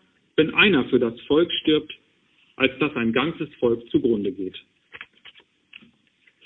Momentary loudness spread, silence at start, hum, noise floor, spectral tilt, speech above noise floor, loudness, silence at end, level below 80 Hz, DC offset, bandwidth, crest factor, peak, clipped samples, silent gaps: 25 LU; 0.4 s; none; -62 dBFS; -8.5 dB/octave; 40 dB; -22 LUFS; 1.15 s; -58 dBFS; under 0.1%; 4.1 kHz; 20 dB; -4 dBFS; under 0.1%; none